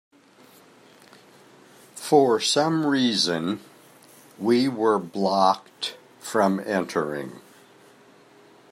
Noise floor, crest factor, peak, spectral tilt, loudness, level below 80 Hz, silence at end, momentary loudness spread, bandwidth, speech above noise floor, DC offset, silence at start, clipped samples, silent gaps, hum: -53 dBFS; 20 dB; -6 dBFS; -4.5 dB/octave; -23 LUFS; -74 dBFS; 1.35 s; 14 LU; 15.5 kHz; 31 dB; under 0.1%; 1.95 s; under 0.1%; none; none